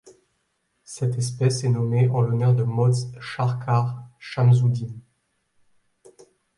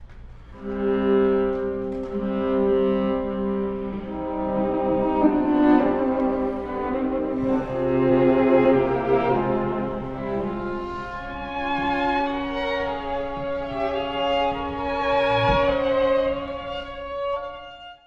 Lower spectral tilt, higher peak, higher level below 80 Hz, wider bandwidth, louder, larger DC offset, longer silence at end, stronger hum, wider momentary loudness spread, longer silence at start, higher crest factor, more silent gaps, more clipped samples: about the same, -7 dB/octave vs -8 dB/octave; about the same, -8 dBFS vs -6 dBFS; second, -60 dBFS vs -42 dBFS; first, 11.5 kHz vs 7 kHz; about the same, -22 LUFS vs -23 LUFS; neither; first, 1.55 s vs 0.1 s; neither; about the same, 14 LU vs 12 LU; about the same, 0.05 s vs 0 s; about the same, 16 dB vs 18 dB; neither; neither